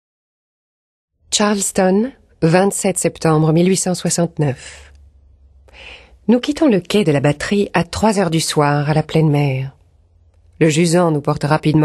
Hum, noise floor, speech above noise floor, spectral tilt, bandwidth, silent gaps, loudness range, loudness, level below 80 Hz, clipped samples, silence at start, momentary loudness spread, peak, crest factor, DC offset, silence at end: none; -52 dBFS; 37 dB; -5.5 dB/octave; 12.5 kHz; none; 3 LU; -16 LUFS; -46 dBFS; under 0.1%; 1.3 s; 7 LU; 0 dBFS; 16 dB; under 0.1%; 0 s